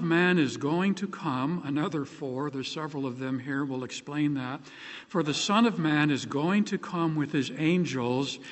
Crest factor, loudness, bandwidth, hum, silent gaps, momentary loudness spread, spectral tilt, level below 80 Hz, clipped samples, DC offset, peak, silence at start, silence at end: 20 dB; -28 LUFS; 8.4 kHz; none; none; 10 LU; -5.5 dB/octave; -72 dBFS; under 0.1%; under 0.1%; -10 dBFS; 0 s; 0 s